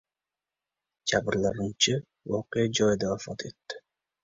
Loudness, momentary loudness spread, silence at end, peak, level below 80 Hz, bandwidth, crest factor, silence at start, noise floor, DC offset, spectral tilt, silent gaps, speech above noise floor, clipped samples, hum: -28 LUFS; 14 LU; 0.45 s; -10 dBFS; -58 dBFS; 7.8 kHz; 20 dB; 1.05 s; under -90 dBFS; under 0.1%; -4 dB/octave; none; over 62 dB; under 0.1%; none